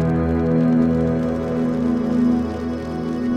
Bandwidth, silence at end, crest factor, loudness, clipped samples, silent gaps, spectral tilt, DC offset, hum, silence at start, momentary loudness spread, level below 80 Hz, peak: 7 kHz; 0 s; 12 dB; -20 LUFS; under 0.1%; none; -9 dB/octave; under 0.1%; none; 0 s; 8 LU; -36 dBFS; -6 dBFS